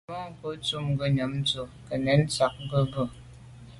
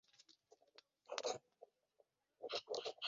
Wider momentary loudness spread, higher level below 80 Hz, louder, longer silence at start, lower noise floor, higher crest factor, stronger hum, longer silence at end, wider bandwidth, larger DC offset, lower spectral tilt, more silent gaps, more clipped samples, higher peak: second, 11 LU vs 23 LU; first, -52 dBFS vs under -90 dBFS; first, -28 LUFS vs -47 LUFS; second, 0.1 s vs 0.3 s; second, -47 dBFS vs -80 dBFS; second, 20 dB vs 28 dB; neither; about the same, 0 s vs 0 s; first, 11.5 kHz vs 7.6 kHz; neither; first, -5.5 dB/octave vs 0.5 dB/octave; neither; neither; first, -8 dBFS vs -22 dBFS